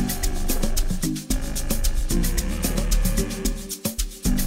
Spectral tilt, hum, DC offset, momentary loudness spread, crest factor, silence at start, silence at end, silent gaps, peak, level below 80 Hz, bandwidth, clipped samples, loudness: -4 dB/octave; none; under 0.1%; 4 LU; 14 dB; 0 s; 0 s; none; -8 dBFS; -24 dBFS; 16.5 kHz; under 0.1%; -26 LUFS